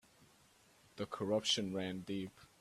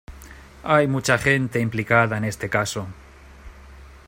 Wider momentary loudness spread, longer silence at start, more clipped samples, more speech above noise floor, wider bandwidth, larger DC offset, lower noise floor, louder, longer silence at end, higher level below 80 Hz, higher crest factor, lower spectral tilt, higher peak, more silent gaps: about the same, 15 LU vs 15 LU; about the same, 0.2 s vs 0.1 s; neither; first, 29 dB vs 23 dB; second, 14 kHz vs 16 kHz; neither; first, -68 dBFS vs -44 dBFS; second, -39 LUFS vs -21 LUFS; about the same, 0.15 s vs 0.1 s; second, -76 dBFS vs -46 dBFS; about the same, 20 dB vs 20 dB; about the same, -4 dB/octave vs -5 dB/octave; second, -22 dBFS vs -4 dBFS; neither